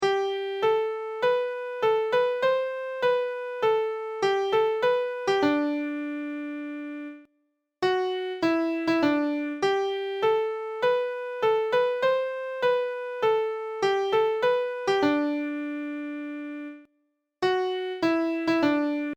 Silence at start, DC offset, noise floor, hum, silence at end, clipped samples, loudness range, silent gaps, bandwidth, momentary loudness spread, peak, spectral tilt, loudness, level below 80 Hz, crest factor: 0 s; under 0.1%; -74 dBFS; none; 0 s; under 0.1%; 4 LU; none; 16.5 kHz; 9 LU; -10 dBFS; -5 dB/octave; -26 LUFS; -68 dBFS; 16 dB